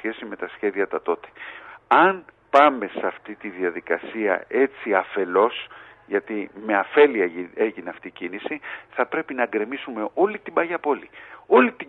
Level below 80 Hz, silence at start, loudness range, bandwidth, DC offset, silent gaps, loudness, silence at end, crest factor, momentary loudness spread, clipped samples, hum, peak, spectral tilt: -70 dBFS; 0.05 s; 4 LU; 6.2 kHz; under 0.1%; none; -23 LUFS; 0.05 s; 20 dB; 17 LU; under 0.1%; none; -2 dBFS; -6.5 dB/octave